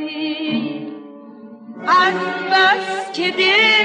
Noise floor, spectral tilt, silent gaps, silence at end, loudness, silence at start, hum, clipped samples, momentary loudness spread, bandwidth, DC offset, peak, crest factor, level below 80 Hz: -38 dBFS; -3.5 dB/octave; none; 0 s; -16 LUFS; 0 s; none; under 0.1%; 17 LU; 10 kHz; under 0.1%; -4 dBFS; 14 dB; -72 dBFS